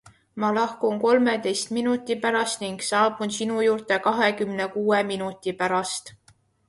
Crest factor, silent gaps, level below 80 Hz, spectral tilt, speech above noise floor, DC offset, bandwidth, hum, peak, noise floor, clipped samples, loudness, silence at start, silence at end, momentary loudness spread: 18 dB; none; -68 dBFS; -3.5 dB/octave; 37 dB; under 0.1%; 11.5 kHz; none; -8 dBFS; -60 dBFS; under 0.1%; -24 LUFS; 0.05 s; 0.6 s; 8 LU